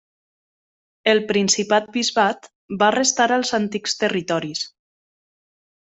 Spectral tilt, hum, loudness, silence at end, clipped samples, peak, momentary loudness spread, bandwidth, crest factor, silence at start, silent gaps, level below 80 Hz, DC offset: -2.5 dB/octave; none; -20 LUFS; 1.15 s; under 0.1%; -2 dBFS; 11 LU; 8.4 kHz; 20 dB; 1.05 s; 2.55-2.69 s; -66 dBFS; under 0.1%